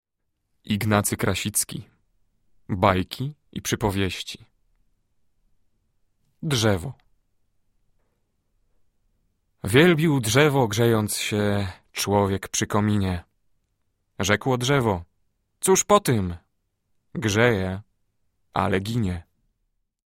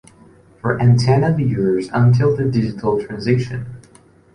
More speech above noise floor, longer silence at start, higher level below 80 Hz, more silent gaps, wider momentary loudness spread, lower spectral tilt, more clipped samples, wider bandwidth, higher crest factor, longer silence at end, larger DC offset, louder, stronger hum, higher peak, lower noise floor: first, 54 dB vs 33 dB; about the same, 0.65 s vs 0.65 s; about the same, -50 dBFS vs -46 dBFS; neither; first, 14 LU vs 11 LU; second, -4.5 dB/octave vs -8 dB/octave; neither; first, 16.5 kHz vs 10 kHz; first, 22 dB vs 14 dB; first, 0.85 s vs 0.55 s; neither; second, -23 LUFS vs -17 LUFS; neither; about the same, -2 dBFS vs -2 dBFS; first, -76 dBFS vs -49 dBFS